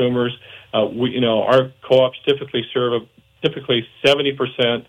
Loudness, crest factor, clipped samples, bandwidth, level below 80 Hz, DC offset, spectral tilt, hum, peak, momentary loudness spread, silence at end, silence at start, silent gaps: -19 LUFS; 16 dB; under 0.1%; 10.5 kHz; -60 dBFS; under 0.1%; -6 dB/octave; none; -4 dBFS; 8 LU; 0.05 s; 0 s; none